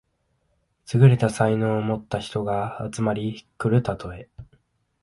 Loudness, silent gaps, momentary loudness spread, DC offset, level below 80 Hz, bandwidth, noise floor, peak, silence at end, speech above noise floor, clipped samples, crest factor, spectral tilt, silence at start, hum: -23 LUFS; none; 14 LU; under 0.1%; -52 dBFS; 11.5 kHz; -70 dBFS; -4 dBFS; 0.6 s; 48 dB; under 0.1%; 18 dB; -7.5 dB/octave; 0.9 s; none